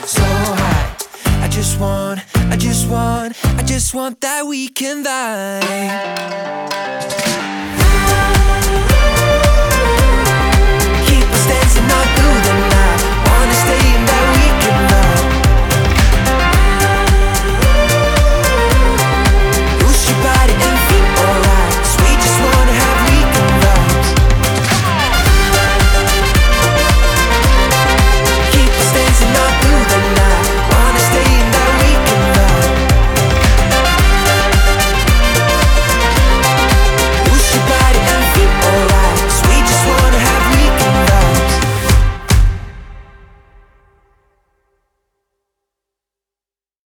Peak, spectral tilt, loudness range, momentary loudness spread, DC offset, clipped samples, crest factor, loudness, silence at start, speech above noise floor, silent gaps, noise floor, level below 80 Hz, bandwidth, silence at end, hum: 0 dBFS; -4 dB/octave; 6 LU; 7 LU; under 0.1%; under 0.1%; 10 dB; -12 LUFS; 0 s; over 75 dB; none; under -90 dBFS; -14 dBFS; 19.5 kHz; 3.85 s; none